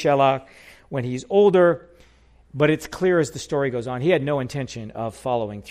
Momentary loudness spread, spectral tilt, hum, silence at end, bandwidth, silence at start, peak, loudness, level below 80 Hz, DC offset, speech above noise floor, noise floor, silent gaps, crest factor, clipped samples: 13 LU; -6.5 dB/octave; none; 0 s; 14.5 kHz; 0 s; -6 dBFS; -22 LUFS; -54 dBFS; under 0.1%; 33 dB; -54 dBFS; none; 16 dB; under 0.1%